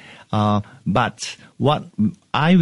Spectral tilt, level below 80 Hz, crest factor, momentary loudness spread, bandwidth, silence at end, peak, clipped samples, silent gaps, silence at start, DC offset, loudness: -6.5 dB/octave; -50 dBFS; 16 dB; 6 LU; 11.5 kHz; 0 s; -4 dBFS; under 0.1%; none; 0.1 s; under 0.1%; -21 LUFS